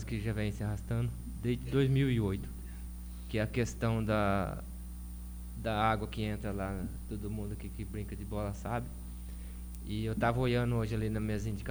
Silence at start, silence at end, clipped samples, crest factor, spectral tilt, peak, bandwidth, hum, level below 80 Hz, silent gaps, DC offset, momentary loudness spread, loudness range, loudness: 0 s; 0 s; under 0.1%; 18 dB; -7 dB/octave; -16 dBFS; over 20 kHz; 60 Hz at -45 dBFS; -44 dBFS; none; under 0.1%; 15 LU; 6 LU; -35 LUFS